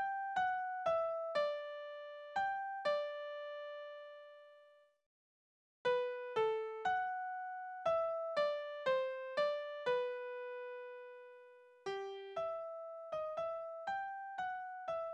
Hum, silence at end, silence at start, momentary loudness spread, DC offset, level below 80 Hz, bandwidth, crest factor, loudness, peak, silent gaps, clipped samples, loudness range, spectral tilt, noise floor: none; 0 s; 0 s; 12 LU; under 0.1%; -82 dBFS; 9.2 kHz; 16 dB; -40 LUFS; -24 dBFS; 5.06-5.85 s; under 0.1%; 7 LU; -3.5 dB/octave; -66 dBFS